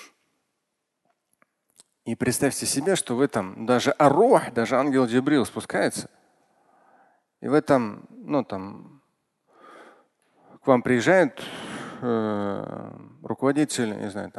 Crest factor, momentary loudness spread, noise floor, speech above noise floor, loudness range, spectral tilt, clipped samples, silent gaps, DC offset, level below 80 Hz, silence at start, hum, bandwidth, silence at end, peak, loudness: 22 dB; 17 LU; -79 dBFS; 56 dB; 7 LU; -5 dB/octave; under 0.1%; none; under 0.1%; -62 dBFS; 0 s; none; 12.5 kHz; 0.1 s; -2 dBFS; -23 LUFS